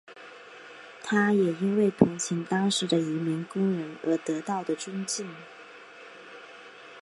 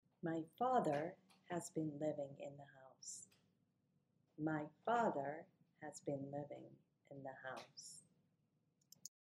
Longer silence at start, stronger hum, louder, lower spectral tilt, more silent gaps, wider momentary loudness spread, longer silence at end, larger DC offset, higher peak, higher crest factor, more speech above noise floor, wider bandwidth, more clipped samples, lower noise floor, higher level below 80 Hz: second, 0.1 s vs 0.25 s; neither; first, -27 LUFS vs -45 LUFS; about the same, -5 dB/octave vs -5.5 dB/octave; neither; about the same, 22 LU vs 21 LU; second, 0 s vs 0.2 s; neither; first, -2 dBFS vs -24 dBFS; about the same, 26 dB vs 22 dB; second, 21 dB vs 38 dB; second, 11.5 kHz vs 13.5 kHz; neither; second, -48 dBFS vs -83 dBFS; first, -64 dBFS vs under -90 dBFS